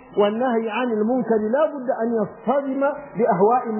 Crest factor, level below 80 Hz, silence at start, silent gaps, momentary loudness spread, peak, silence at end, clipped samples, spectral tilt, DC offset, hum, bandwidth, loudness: 14 dB; -64 dBFS; 0.1 s; none; 5 LU; -6 dBFS; 0 s; under 0.1%; -10.5 dB/octave; under 0.1%; none; 3.2 kHz; -21 LUFS